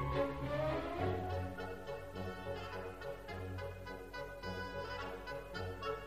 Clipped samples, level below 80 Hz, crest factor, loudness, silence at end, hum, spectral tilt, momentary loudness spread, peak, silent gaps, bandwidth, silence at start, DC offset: under 0.1%; -54 dBFS; 18 dB; -43 LUFS; 0 s; none; -6.5 dB/octave; 8 LU; -24 dBFS; none; 15.5 kHz; 0 s; under 0.1%